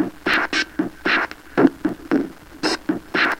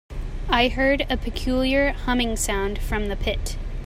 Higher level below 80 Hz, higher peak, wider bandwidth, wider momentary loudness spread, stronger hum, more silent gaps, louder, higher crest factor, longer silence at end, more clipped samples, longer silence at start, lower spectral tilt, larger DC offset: second, -50 dBFS vs -28 dBFS; first, 0 dBFS vs -6 dBFS; about the same, 16.5 kHz vs 16 kHz; about the same, 7 LU vs 9 LU; neither; neither; about the same, -21 LUFS vs -23 LUFS; first, 22 dB vs 16 dB; about the same, 0 s vs 0 s; neither; about the same, 0 s vs 0.1 s; about the same, -4 dB/octave vs -4 dB/octave; neither